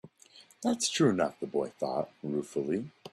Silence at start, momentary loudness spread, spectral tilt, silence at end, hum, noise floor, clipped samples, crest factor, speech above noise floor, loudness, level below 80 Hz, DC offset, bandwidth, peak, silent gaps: 0.05 s; 9 LU; -4.5 dB/octave; 0.05 s; none; -58 dBFS; under 0.1%; 18 dB; 27 dB; -31 LUFS; -72 dBFS; under 0.1%; 13.5 kHz; -14 dBFS; none